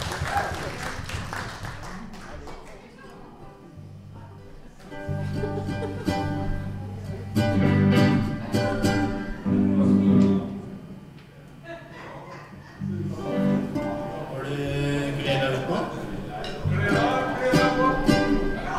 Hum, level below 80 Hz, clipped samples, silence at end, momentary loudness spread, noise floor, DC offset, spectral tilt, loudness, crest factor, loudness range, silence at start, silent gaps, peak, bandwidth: none; -40 dBFS; under 0.1%; 0 s; 23 LU; -45 dBFS; under 0.1%; -6.5 dB/octave; -25 LUFS; 20 dB; 14 LU; 0 s; none; -6 dBFS; 15 kHz